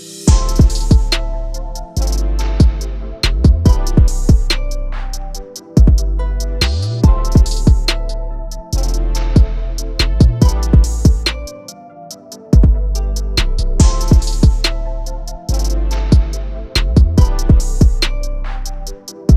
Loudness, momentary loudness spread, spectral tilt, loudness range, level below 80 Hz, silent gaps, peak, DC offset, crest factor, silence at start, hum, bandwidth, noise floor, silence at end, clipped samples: -15 LUFS; 15 LU; -5.5 dB/octave; 1 LU; -14 dBFS; none; 0 dBFS; under 0.1%; 12 dB; 0 s; none; 14 kHz; -35 dBFS; 0 s; under 0.1%